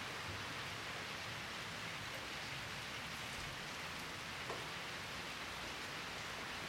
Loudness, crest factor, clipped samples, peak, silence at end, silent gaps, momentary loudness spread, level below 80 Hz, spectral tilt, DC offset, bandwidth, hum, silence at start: -44 LUFS; 18 dB; under 0.1%; -28 dBFS; 0 s; none; 1 LU; -64 dBFS; -2.5 dB/octave; under 0.1%; 16 kHz; none; 0 s